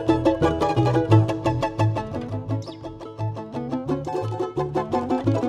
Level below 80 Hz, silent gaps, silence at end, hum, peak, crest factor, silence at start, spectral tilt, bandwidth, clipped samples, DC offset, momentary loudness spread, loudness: -44 dBFS; none; 0 s; none; -4 dBFS; 18 dB; 0 s; -8 dB/octave; 9.8 kHz; under 0.1%; under 0.1%; 12 LU; -24 LUFS